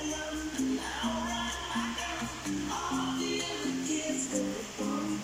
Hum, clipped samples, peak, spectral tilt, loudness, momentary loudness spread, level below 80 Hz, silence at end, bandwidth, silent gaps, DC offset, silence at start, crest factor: none; under 0.1%; -18 dBFS; -3 dB/octave; -33 LUFS; 3 LU; -52 dBFS; 0 s; 16 kHz; none; under 0.1%; 0 s; 16 dB